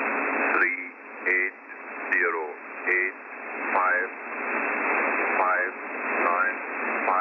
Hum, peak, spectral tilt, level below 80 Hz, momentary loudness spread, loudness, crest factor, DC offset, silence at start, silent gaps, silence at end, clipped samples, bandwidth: none; -8 dBFS; -6.5 dB/octave; -88 dBFS; 10 LU; -25 LUFS; 18 dB; under 0.1%; 0 s; none; 0 s; under 0.1%; 6 kHz